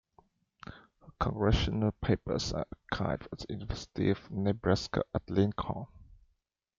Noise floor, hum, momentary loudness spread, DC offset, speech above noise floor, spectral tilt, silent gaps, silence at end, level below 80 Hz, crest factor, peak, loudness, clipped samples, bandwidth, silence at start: -77 dBFS; none; 12 LU; under 0.1%; 46 dB; -6.5 dB/octave; none; 0.75 s; -44 dBFS; 20 dB; -14 dBFS; -33 LUFS; under 0.1%; 7.6 kHz; 0.65 s